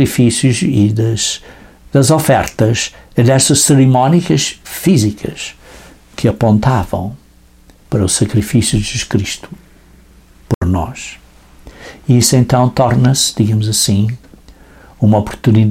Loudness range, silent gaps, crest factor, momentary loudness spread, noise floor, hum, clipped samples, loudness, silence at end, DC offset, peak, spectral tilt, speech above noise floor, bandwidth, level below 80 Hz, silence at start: 6 LU; 10.55-10.61 s; 14 dB; 13 LU; -44 dBFS; none; under 0.1%; -13 LUFS; 0 s; under 0.1%; 0 dBFS; -5 dB/octave; 32 dB; 16.5 kHz; -36 dBFS; 0 s